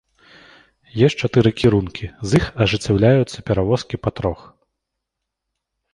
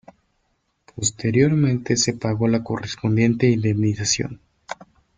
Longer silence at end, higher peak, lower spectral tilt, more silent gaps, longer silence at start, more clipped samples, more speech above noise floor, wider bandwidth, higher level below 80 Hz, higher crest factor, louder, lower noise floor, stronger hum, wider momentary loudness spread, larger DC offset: first, 1.6 s vs 0.45 s; about the same, -2 dBFS vs -4 dBFS; first, -6.5 dB/octave vs -5 dB/octave; neither; about the same, 0.95 s vs 0.95 s; neither; first, 63 dB vs 50 dB; first, 11 kHz vs 9.6 kHz; first, -40 dBFS vs -52 dBFS; about the same, 18 dB vs 18 dB; first, -18 LUFS vs -21 LUFS; first, -80 dBFS vs -69 dBFS; neither; second, 11 LU vs 14 LU; neither